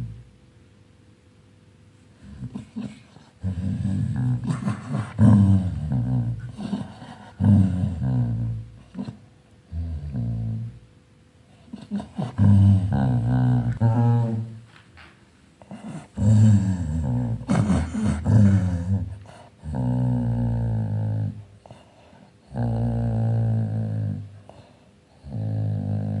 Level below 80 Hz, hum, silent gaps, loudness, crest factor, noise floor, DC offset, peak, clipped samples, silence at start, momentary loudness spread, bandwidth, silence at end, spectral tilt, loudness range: -42 dBFS; none; none; -23 LUFS; 18 dB; -54 dBFS; under 0.1%; -4 dBFS; under 0.1%; 0 s; 20 LU; 9.6 kHz; 0 s; -9 dB/octave; 11 LU